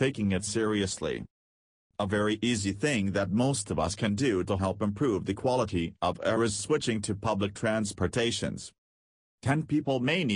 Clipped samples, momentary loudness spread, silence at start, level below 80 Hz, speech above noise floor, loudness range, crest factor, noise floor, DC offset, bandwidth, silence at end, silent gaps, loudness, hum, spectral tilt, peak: under 0.1%; 6 LU; 0 s; -54 dBFS; over 62 dB; 2 LU; 16 dB; under -90 dBFS; under 0.1%; 11 kHz; 0 s; 1.30-1.90 s, 8.78-9.38 s; -29 LUFS; none; -5 dB/octave; -14 dBFS